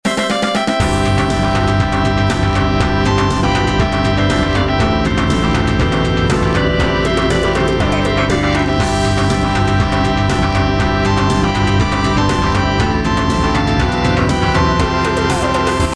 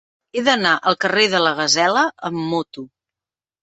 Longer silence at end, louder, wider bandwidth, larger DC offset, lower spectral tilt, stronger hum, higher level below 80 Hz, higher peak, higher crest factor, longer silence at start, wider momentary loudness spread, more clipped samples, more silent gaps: second, 0 s vs 0.75 s; about the same, -15 LUFS vs -17 LUFS; first, 11 kHz vs 8.4 kHz; first, 0.4% vs under 0.1%; first, -5.5 dB/octave vs -2.5 dB/octave; neither; first, -24 dBFS vs -64 dBFS; about the same, -2 dBFS vs 0 dBFS; second, 12 dB vs 18 dB; second, 0.05 s vs 0.35 s; second, 1 LU vs 11 LU; neither; neither